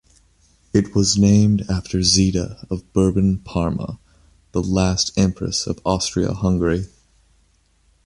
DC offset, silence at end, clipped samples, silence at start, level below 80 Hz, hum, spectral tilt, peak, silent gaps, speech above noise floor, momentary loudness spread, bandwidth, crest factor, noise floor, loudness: under 0.1%; 1.2 s; under 0.1%; 0.75 s; -36 dBFS; none; -5 dB/octave; -2 dBFS; none; 41 dB; 12 LU; 11.5 kHz; 18 dB; -59 dBFS; -19 LUFS